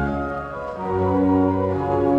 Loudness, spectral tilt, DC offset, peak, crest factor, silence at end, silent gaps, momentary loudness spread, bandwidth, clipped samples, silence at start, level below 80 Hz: -22 LUFS; -10 dB/octave; under 0.1%; -8 dBFS; 14 dB; 0 s; none; 10 LU; 5.4 kHz; under 0.1%; 0 s; -40 dBFS